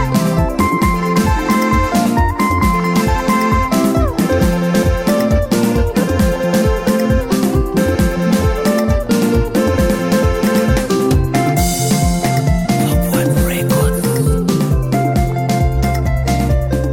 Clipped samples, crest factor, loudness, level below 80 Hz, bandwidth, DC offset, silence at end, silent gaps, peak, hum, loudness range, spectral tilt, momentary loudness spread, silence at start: under 0.1%; 10 dB; -15 LUFS; -22 dBFS; 17 kHz; under 0.1%; 0 s; none; -2 dBFS; none; 1 LU; -6 dB/octave; 2 LU; 0 s